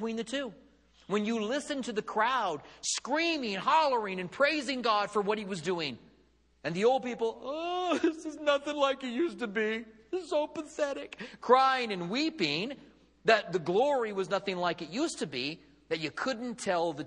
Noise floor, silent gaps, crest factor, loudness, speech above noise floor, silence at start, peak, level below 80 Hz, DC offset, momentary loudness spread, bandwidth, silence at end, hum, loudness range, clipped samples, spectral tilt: -66 dBFS; none; 22 dB; -31 LUFS; 35 dB; 0 s; -8 dBFS; -70 dBFS; under 0.1%; 10 LU; 11 kHz; 0 s; none; 3 LU; under 0.1%; -3.5 dB/octave